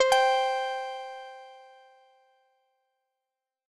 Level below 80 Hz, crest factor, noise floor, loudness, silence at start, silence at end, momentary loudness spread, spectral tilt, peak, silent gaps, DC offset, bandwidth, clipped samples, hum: -74 dBFS; 20 dB; -88 dBFS; -27 LUFS; 0 s; 2.1 s; 24 LU; 1.5 dB/octave; -10 dBFS; none; under 0.1%; 12 kHz; under 0.1%; none